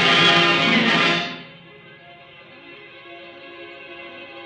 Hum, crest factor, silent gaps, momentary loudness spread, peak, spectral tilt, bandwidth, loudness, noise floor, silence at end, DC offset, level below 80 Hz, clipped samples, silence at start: none; 20 dB; none; 26 LU; -2 dBFS; -3.5 dB/octave; 10 kHz; -16 LUFS; -45 dBFS; 0 s; under 0.1%; -64 dBFS; under 0.1%; 0 s